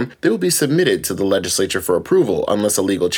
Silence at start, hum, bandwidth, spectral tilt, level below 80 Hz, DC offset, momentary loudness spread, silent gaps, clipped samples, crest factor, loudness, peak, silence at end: 0 s; none; 19.5 kHz; -4 dB/octave; -52 dBFS; under 0.1%; 3 LU; none; under 0.1%; 14 dB; -17 LUFS; -2 dBFS; 0 s